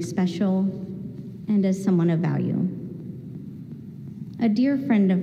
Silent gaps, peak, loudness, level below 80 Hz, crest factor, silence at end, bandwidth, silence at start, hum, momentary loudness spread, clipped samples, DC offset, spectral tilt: none; -10 dBFS; -23 LUFS; -62 dBFS; 14 dB; 0 s; 9.2 kHz; 0 s; none; 17 LU; under 0.1%; under 0.1%; -8 dB/octave